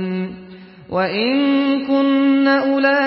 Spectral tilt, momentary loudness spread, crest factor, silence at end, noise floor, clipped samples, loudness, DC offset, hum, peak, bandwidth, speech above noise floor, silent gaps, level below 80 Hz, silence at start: -10.5 dB/octave; 11 LU; 14 dB; 0 s; -39 dBFS; under 0.1%; -17 LUFS; under 0.1%; none; -4 dBFS; 5.8 kHz; 23 dB; none; -58 dBFS; 0 s